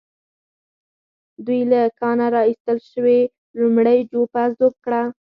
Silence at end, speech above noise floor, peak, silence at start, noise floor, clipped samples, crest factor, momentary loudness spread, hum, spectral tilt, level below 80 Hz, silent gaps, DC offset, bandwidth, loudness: 0.2 s; over 73 dB; -4 dBFS; 1.4 s; under -90 dBFS; under 0.1%; 14 dB; 7 LU; none; -9 dB/octave; -68 dBFS; 2.60-2.65 s, 3.38-3.54 s; under 0.1%; 5.2 kHz; -18 LUFS